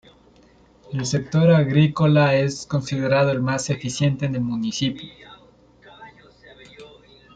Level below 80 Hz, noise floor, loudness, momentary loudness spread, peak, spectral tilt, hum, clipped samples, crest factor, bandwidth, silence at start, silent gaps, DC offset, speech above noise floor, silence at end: -54 dBFS; -53 dBFS; -20 LUFS; 10 LU; -4 dBFS; -6 dB/octave; none; under 0.1%; 18 dB; 9.2 kHz; 0.9 s; none; under 0.1%; 34 dB; 0.5 s